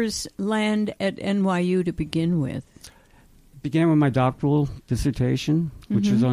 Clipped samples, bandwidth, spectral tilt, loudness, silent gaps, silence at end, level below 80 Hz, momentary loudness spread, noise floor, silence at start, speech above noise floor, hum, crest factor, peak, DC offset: under 0.1%; 14.5 kHz; -6.5 dB/octave; -23 LUFS; none; 0 s; -44 dBFS; 7 LU; -53 dBFS; 0 s; 31 dB; none; 14 dB; -10 dBFS; under 0.1%